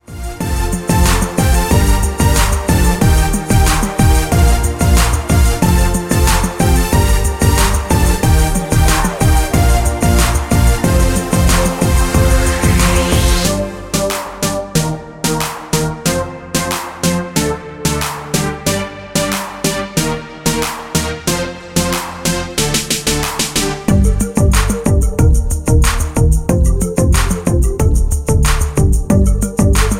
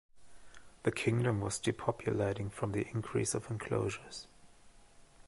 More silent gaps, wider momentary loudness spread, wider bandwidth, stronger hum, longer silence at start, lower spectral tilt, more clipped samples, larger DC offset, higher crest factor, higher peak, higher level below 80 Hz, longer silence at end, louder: neither; about the same, 6 LU vs 8 LU; first, 17 kHz vs 11.5 kHz; neither; about the same, 0.1 s vs 0.15 s; about the same, -4.5 dB/octave vs -5.5 dB/octave; neither; neither; second, 12 dB vs 22 dB; first, 0 dBFS vs -14 dBFS; first, -16 dBFS vs -60 dBFS; about the same, 0 s vs 0.05 s; first, -14 LUFS vs -35 LUFS